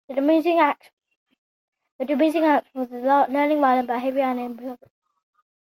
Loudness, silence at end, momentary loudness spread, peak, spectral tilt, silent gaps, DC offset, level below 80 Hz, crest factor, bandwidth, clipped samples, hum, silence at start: -21 LUFS; 0.95 s; 14 LU; -4 dBFS; -5 dB/octave; 0.93-0.97 s, 1.16-1.26 s, 1.38-1.72 s, 1.91-1.99 s; under 0.1%; -74 dBFS; 18 dB; 16.5 kHz; under 0.1%; none; 0.1 s